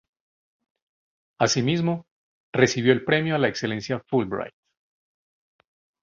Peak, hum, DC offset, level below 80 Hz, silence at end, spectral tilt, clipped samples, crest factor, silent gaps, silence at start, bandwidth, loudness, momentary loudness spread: -4 dBFS; none; under 0.1%; -60 dBFS; 1.55 s; -5 dB/octave; under 0.1%; 22 dB; 2.11-2.53 s; 1.4 s; 7.6 kHz; -23 LUFS; 10 LU